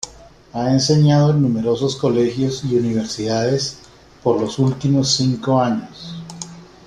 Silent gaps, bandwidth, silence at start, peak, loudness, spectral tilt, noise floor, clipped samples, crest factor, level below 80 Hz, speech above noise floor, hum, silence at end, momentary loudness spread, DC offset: none; 10.5 kHz; 0.05 s; -2 dBFS; -18 LUFS; -6 dB/octave; -43 dBFS; under 0.1%; 16 dB; -50 dBFS; 26 dB; none; 0.2 s; 18 LU; under 0.1%